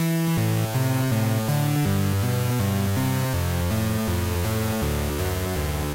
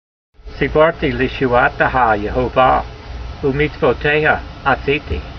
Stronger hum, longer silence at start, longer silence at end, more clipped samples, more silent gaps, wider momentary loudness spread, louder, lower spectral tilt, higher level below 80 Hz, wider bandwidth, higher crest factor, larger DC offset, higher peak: neither; second, 0 s vs 0.45 s; about the same, 0 s vs 0 s; neither; neither; second, 3 LU vs 7 LU; second, -24 LUFS vs -16 LUFS; second, -6 dB/octave vs -7.5 dB/octave; second, -36 dBFS vs -30 dBFS; first, 16 kHz vs 6.4 kHz; second, 10 dB vs 16 dB; neither; second, -14 dBFS vs 0 dBFS